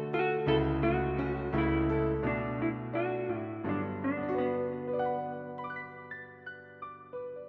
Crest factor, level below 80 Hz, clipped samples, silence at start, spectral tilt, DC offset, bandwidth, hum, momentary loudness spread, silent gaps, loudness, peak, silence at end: 18 dB; -46 dBFS; under 0.1%; 0 s; -10 dB/octave; under 0.1%; 5.2 kHz; none; 15 LU; none; -32 LUFS; -14 dBFS; 0 s